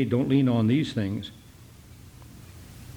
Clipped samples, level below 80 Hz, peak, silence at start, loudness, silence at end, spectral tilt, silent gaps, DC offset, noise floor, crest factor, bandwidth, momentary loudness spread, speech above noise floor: under 0.1%; -54 dBFS; -10 dBFS; 0 s; -25 LUFS; 0.05 s; -7.5 dB/octave; none; under 0.1%; -49 dBFS; 16 dB; 19 kHz; 25 LU; 25 dB